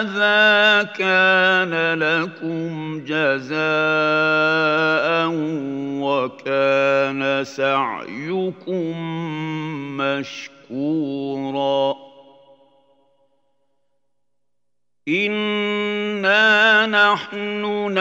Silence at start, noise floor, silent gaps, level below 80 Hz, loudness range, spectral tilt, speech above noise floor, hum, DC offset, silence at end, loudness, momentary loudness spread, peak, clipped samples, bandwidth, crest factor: 0 s; -82 dBFS; none; -76 dBFS; 9 LU; -5 dB/octave; 63 dB; 60 Hz at -60 dBFS; under 0.1%; 0 s; -19 LUFS; 13 LU; -2 dBFS; under 0.1%; 8 kHz; 18 dB